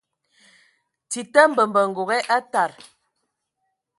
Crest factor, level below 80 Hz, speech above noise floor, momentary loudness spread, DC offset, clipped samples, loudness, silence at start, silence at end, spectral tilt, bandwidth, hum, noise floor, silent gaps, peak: 22 dB; -78 dBFS; 57 dB; 11 LU; under 0.1%; under 0.1%; -20 LUFS; 1.1 s; 1.25 s; -3 dB/octave; 11.5 kHz; none; -77 dBFS; none; 0 dBFS